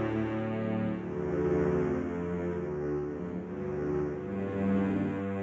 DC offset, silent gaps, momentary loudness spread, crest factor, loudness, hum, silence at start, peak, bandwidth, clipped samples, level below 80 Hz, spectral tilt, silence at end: under 0.1%; none; 6 LU; 14 dB; -32 LUFS; none; 0 s; -16 dBFS; 7.8 kHz; under 0.1%; -50 dBFS; -9.5 dB/octave; 0 s